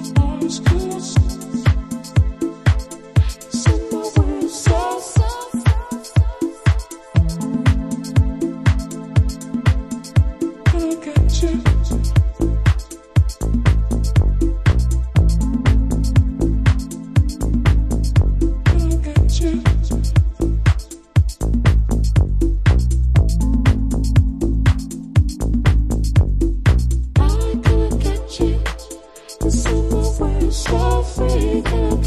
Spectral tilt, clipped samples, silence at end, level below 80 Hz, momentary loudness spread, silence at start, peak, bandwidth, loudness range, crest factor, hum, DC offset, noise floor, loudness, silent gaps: -6.5 dB/octave; under 0.1%; 0 s; -20 dBFS; 4 LU; 0 s; -2 dBFS; 13.5 kHz; 2 LU; 14 dB; none; under 0.1%; -36 dBFS; -18 LUFS; none